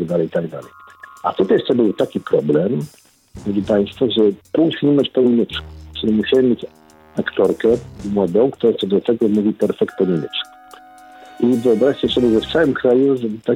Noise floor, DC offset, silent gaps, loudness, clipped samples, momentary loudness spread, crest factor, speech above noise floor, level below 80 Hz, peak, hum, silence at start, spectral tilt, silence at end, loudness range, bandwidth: -42 dBFS; under 0.1%; none; -17 LUFS; under 0.1%; 10 LU; 14 dB; 25 dB; -48 dBFS; -4 dBFS; none; 0 s; -7 dB/octave; 0 s; 2 LU; 13 kHz